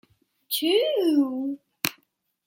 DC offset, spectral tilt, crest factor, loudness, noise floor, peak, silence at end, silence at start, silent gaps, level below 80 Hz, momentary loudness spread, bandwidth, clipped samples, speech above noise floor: under 0.1%; -3 dB/octave; 24 dB; -25 LUFS; -70 dBFS; -4 dBFS; 0.55 s; 0.5 s; none; -78 dBFS; 8 LU; 17 kHz; under 0.1%; 47 dB